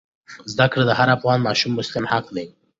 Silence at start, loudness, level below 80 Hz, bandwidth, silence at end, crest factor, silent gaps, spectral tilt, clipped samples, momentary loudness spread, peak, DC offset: 0.3 s; -19 LUFS; -56 dBFS; 7.8 kHz; 0.3 s; 18 dB; none; -5.5 dB/octave; under 0.1%; 14 LU; -2 dBFS; under 0.1%